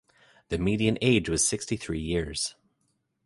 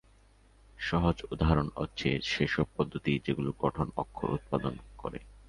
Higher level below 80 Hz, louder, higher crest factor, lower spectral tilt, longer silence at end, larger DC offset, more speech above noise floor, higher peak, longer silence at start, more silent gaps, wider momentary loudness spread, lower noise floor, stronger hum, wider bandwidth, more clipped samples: about the same, -46 dBFS vs -44 dBFS; first, -27 LUFS vs -32 LUFS; about the same, 20 dB vs 22 dB; second, -4 dB/octave vs -6.5 dB/octave; first, 0.75 s vs 0.05 s; neither; first, 48 dB vs 30 dB; about the same, -8 dBFS vs -10 dBFS; second, 0.5 s vs 0.8 s; neither; about the same, 9 LU vs 10 LU; first, -75 dBFS vs -61 dBFS; neither; about the same, 11.5 kHz vs 11 kHz; neither